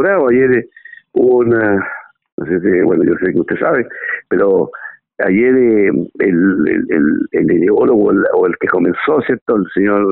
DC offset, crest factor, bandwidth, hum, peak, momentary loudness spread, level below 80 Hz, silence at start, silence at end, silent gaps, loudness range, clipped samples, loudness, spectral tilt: under 0.1%; 10 dB; 4.1 kHz; none; -2 dBFS; 10 LU; -52 dBFS; 0 s; 0 s; 2.32-2.38 s, 9.42-9.46 s; 3 LU; under 0.1%; -13 LUFS; -7 dB/octave